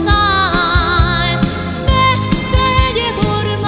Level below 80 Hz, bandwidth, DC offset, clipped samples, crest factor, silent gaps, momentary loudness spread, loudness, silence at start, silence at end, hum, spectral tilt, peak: -20 dBFS; 4 kHz; 0.1%; under 0.1%; 14 dB; none; 4 LU; -13 LUFS; 0 s; 0 s; none; -9.5 dB/octave; 0 dBFS